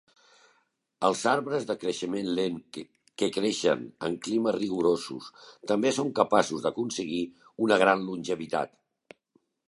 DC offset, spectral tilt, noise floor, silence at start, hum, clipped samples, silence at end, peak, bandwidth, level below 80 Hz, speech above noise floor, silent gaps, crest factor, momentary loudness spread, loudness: under 0.1%; -4.5 dB/octave; -71 dBFS; 1 s; none; under 0.1%; 1 s; -6 dBFS; 11.5 kHz; -70 dBFS; 44 dB; none; 22 dB; 15 LU; -28 LUFS